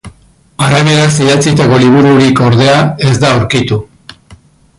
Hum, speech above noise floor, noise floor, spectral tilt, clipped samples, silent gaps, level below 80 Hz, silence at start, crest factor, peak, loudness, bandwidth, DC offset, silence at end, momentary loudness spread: none; 36 dB; -43 dBFS; -5.5 dB/octave; under 0.1%; none; -38 dBFS; 0.05 s; 8 dB; 0 dBFS; -8 LUFS; 11.5 kHz; under 0.1%; 0.95 s; 6 LU